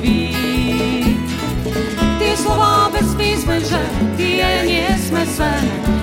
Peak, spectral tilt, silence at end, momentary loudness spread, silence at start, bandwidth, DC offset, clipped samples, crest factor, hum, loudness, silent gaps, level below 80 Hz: -2 dBFS; -5 dB/octave; 0 s; 5 LU; 0 s; 17 kHz; under 0.1%; under 0.1%; 14 dB; none; -16 LUFS; none; -26 dBFS